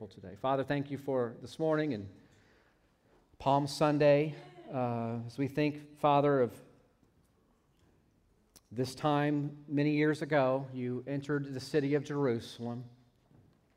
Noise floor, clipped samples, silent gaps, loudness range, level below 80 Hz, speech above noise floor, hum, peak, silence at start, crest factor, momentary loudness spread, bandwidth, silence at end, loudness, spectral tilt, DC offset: -70 dBFS; under 0.1%; none; 5 LU; -70 dBFS; 38 dB; none; -14 dBFS; 0 s; 18 dB; 12 LU; 15 kHz; 0.85 s; -32 LUFS; -7 dB/octave; under 0.1%